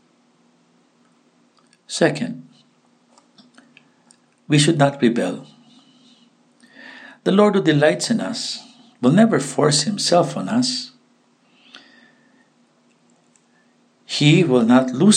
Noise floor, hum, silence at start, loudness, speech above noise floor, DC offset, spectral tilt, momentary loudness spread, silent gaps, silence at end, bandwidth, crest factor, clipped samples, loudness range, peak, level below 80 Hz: -59 dBFS; none; 1.9 s; -18 LUFS; 42 dB; under 0.1%; -5 dB/octave; 15 LU; none; 0 s; 10 kHz; 20 dB; under 0.1%; 10 LU; -2 dBFS; -70 dBFS